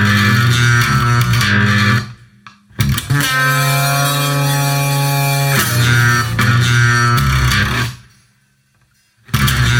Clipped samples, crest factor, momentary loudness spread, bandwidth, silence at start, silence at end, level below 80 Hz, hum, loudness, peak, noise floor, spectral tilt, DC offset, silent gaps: under 0.1%; 14 dB; 5 LU; 17.5 kHz; 0 s; 0 s; -30 dBFS; none; -13 LUFS; 0 dBFS; -57 dBFS; -4 dB/octave; under 0.1%; none